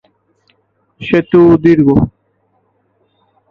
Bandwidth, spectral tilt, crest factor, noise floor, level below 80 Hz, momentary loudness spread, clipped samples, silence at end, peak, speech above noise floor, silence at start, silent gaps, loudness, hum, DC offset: 5.6 kHz; -9.5 dB/octave; 14 dB; -60 dBFS; -38 dBFS; 11 LU; under 0.1%; 1.4 s; 0 dBFS; 51 dB; 1 s; none; -10 LUFS; none; under 0.1%